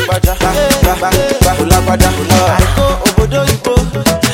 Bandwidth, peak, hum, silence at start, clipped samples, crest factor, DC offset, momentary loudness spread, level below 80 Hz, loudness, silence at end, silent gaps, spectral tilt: 17.5 kHz; 0 dBFS; none; 0 s; 0.4%; 10 dB; 0.2%; 3 LU; -18 dBFS; -11 LUFS; 0 s; none; -4.5 dB/octave